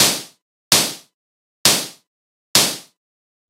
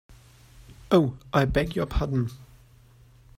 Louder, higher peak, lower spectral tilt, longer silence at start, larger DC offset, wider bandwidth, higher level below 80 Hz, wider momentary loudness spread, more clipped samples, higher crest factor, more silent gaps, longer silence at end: first, -16 LUFS vs -25 LUFS; first, 0 dBFS vs -8 dBFS; second, -0.5 dB/octave vs -7.5 dB/octave; second, 0 s vs 0.6 s; neither; about the same, 16 kHz vs 16 kHz; second, -64 dBFS vs -38 dBFS; first, 17 LU vs 6 LU; neither; about the same, 22 dB vs 20 dB; first, 0.42-0.71 s, 1.14-1.65 s, 2.07-2.54 s vs none; second, 0.7 s vs 0.95 s